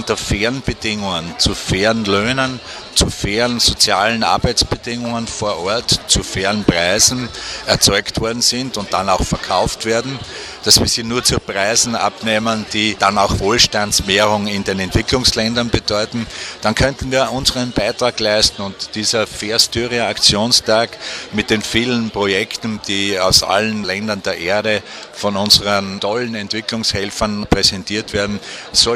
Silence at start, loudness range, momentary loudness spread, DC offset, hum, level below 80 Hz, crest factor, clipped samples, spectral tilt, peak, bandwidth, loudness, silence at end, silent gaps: 0 s; 2 LU; 9 LU; under 0.1%; none; -34 dBFS; 16 dB; under 0.1%; -2.5 dB/octave; 0 dBFS; 16 kHz; -15 LUFS; 0 s; none